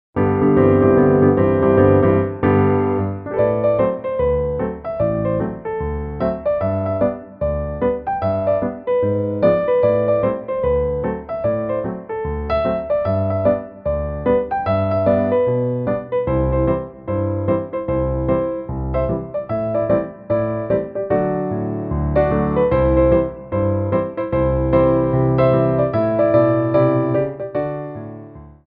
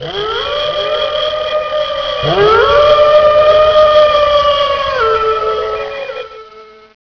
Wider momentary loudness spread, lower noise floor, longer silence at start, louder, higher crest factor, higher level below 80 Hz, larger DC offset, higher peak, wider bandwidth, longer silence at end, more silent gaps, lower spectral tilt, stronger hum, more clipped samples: about the same, 9 LU vs 11 LU; about the same, -38 dBFS vs -37 dBFS; first, 0.15 s vs 0 s; second, -18 LUFS vs -11 LUFS; first, 16 dB vs 10 dB; about the same, -34 dBFS vs -36 dBFS; second, under 0.1% vs 0.3%; about the same, -2 dBFS vs 0 dBFS; about the same, 5 kHz vs 5.4 kHz; second, 0.15 s vs 0.5 s; neither; first, -12.5 dB/octave vs -4.5 dB/octave; neither; neither